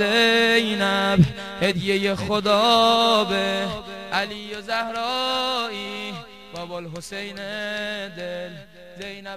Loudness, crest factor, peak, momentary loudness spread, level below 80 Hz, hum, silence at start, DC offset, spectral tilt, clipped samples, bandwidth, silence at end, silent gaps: -21 LUFS; 18 dB; -4 dBFS; 17 LU; -50 dBFS; none; 0 s; 0.2%; -4.5 dB/octave; under 0.1%; 15 kHz; 0 s; none